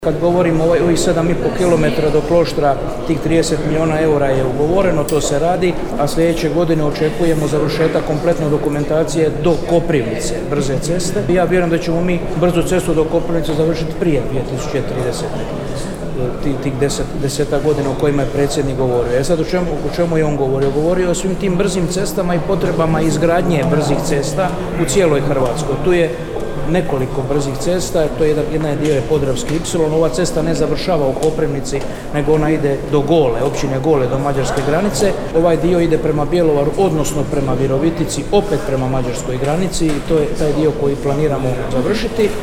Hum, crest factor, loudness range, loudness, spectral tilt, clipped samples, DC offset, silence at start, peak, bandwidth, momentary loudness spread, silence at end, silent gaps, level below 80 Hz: none; 14 dB; 2 LU; -16 LUFS; -6 dB/octave; under 0.1%; under 0.1%; 0 s; 0 dBFS; 17 kHz; 5 LU; 0 s; none; -28 dBFS